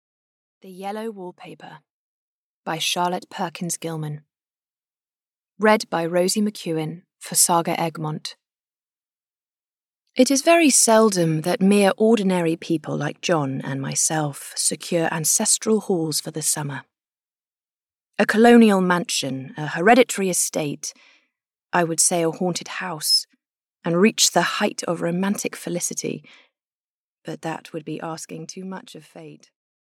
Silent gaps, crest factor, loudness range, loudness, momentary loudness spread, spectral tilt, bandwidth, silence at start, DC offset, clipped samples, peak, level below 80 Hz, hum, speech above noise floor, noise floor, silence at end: 1.90-2.64 s, 5.28-5.32 s, 26.67-27.17 s; 18 dB; 10 LU; -20 LUFS; 18 LU; -3.5 dB/octave; 17 kHz; 0.65 s; under 0.1%; under 0.1%; -4 dBFS; -72 dBFS; none; over 69 dB; under -90 dBFS; 0.65 s